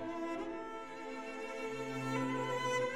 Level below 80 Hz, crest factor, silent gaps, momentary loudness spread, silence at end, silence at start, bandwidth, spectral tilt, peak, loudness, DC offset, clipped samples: -70 dBFS; 14 dB; none; 9 LU; 0 s; 0 s; 15.5 kHz; -5 dB/octave; -24 dBFS; -40 LUFS; 0.2%; under 0.1%